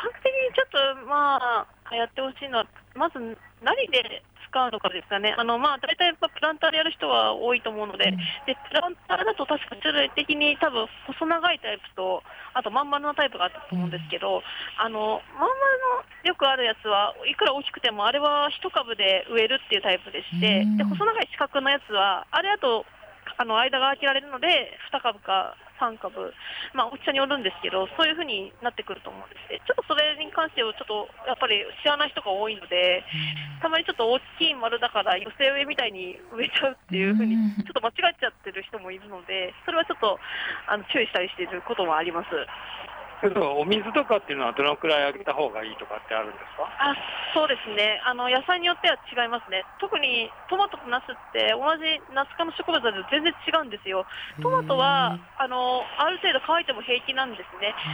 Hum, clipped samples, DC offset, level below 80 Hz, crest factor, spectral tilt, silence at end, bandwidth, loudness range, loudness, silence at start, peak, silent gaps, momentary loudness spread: none; under 0.1%; under 0.1%; -62 dBFS; 16 dB; -5.5 dB/octave; 0 s; over 20 kHz; 4 LU; -25 LUFS; 0 s; -10 dBFS; none; 10 LU